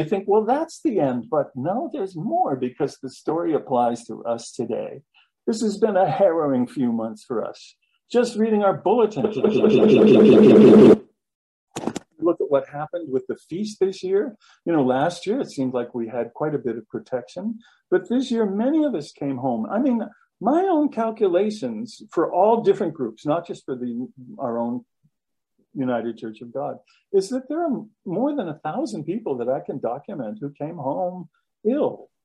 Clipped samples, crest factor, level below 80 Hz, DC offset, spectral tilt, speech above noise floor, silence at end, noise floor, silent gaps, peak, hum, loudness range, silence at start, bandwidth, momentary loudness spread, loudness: under 0.1%; 20 dB; -64 dBFS; under 0.1%; -7 dB/octave; 61 dB; 0.2 s; -82 dBFS; 11.35-11.67 s; -2 dBFS; none; 13 LU; 0 s; 11.5 kHz; 14 LU; -21 LUFS